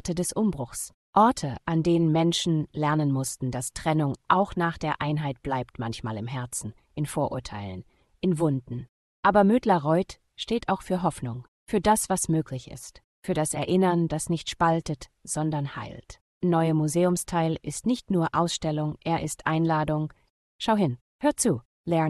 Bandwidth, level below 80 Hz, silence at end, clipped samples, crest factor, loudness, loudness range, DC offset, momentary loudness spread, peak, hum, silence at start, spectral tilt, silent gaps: 12.5 kHz; -52 dBFS; 0 s; under 0.1%; 20 dB; -26 LUFS; 5 LU; under 0.1%; 13 LU; -6 dBFS; none; 0.05 s; -5.5 dB/octave; 0.94-1.13 s, 8.89-9.23 s, 11.48-11.66 s, 13.04-13.23 s, 16.21-16.41 s, 20.30-20.59 s, 21.01-21.19 s, 21.65-21.84 s